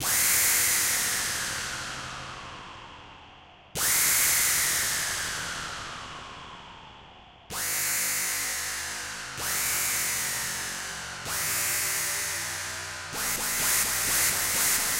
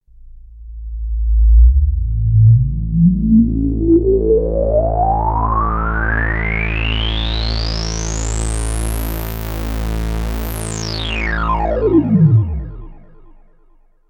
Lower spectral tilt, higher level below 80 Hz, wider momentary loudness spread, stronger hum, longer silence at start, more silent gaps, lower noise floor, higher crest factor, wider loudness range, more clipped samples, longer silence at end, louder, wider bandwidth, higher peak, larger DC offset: second, 0.5 dB/octave vs -6 dB/octave; second, -54 dBFS vs -20 dBFS; first, 19 LU vs 11 LU; neither; second, 0 s vs 0.25 s; neither; about the same, -51 dBFS vs -49 dBFS; about the same, 18 dB vs 14 dB; second, 5 LU vs 8 LU; neither; second, 0 s vs 1.1 s; second, -25 LUFS vs -16 LUFS; second, 16 kHz vs 18.5 kHz; second, -10 dBFS vs -2 dBFS; neither